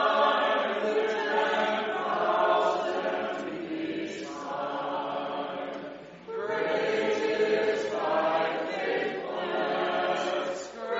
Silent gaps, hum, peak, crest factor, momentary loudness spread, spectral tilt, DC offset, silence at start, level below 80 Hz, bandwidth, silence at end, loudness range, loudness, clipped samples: none; none; -12 dBFS; 16 dB; 10 LU; -1.5 dB/octave; under 0.1%; 0 s; -72 dBFS; 7.6 kHz; 0 s; 6 LU; -29 LUFS; under 0.1%